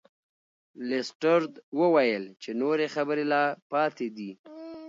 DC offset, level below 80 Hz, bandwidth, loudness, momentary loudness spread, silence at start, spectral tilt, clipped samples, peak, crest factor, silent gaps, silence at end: under 0.1%; -82 dBFS; 7.8 kHz; -27 LUFS; 16 LU; 0.8 s; -5.5 dB/octave; under 0.1%; -10 dBFS; 18 dB; 1.15-1.20 s, 1.63-1.72 s, 3.62-3.70 s, 4.39-4.44 s; 0 s